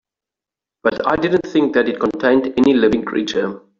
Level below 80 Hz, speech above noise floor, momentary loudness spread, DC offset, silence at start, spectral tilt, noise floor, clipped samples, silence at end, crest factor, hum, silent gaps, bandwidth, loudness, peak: -52 dBFS; 71 dB; 7 LU; under 0.1%; 0.85 s; -6 dB/octave; -87 dBFS; under 0.1%; 0.2 s; 16 dB; none; none; 7.4 kHz; -17 LUFS; -2 dBFS